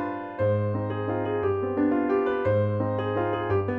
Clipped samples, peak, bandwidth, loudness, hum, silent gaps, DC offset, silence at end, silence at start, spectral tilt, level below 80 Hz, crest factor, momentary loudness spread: under 0.1%; -14 dBFS; 4.6 kHz; -26 LUFS; none; none; under 0.1%; 0 s; 0 s; -10.5 dB/octave; -54 dBFS; 12 dB; 4 LU